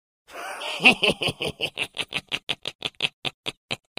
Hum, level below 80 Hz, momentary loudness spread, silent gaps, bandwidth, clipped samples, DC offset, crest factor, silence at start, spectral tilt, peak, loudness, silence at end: none; -58 dBFS; 17 LU; 2.43-2.47 s, 2.75-2.79 s, 3.13-3.22 s, 3.34-3.44 s, 3.57-3.69 s; 16 kHz; under 0.1%; under 0.1%; 26 dB; 0.3 s; -2.5 dB/octave; 0 dBFS; -24 LUFS; 0.2 s